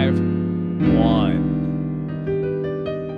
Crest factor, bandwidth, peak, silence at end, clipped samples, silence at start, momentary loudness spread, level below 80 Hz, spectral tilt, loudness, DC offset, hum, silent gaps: 16 dB; 5.2 kHz; -4 dBFS; 0 s; under 0.1%; 0 s; 9 LU; -38 dBFS; -10 dB/octave; -21 LUFS; under 0.1%; none; none